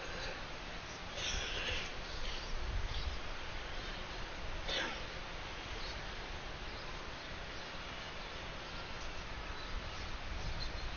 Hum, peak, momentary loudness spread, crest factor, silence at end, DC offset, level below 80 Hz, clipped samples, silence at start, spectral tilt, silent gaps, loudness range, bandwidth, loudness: none; -24 dBFS; 7 LU; 18 dB; 0 s; under 0.1%; -46 dBFS; under 0.1%; 0 s; -2 dB/octave; none; 4 LU; 6.8 kHz; -43 LUFS